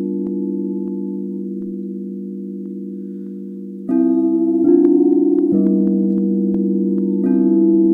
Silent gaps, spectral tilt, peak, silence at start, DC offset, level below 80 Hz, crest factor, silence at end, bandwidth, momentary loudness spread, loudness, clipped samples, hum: none; -13 dB/octave; -2 dBFS; 0 s; under 0.1%; -60 dBFS; 16 dB; 0 s; 1.7 kHz; 15 LU; -17 LUFS; under 0.1%; none